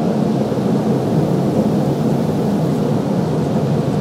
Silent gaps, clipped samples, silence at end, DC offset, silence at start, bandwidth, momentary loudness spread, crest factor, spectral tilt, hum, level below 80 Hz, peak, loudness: none; under 0.1%; 0 s; under 0.1%; 0 s; 15.5 kHz; 1 LU; 12 dB; -8 dB/octave; none; -46 dBFS; -4 dBFS; -17 LUFS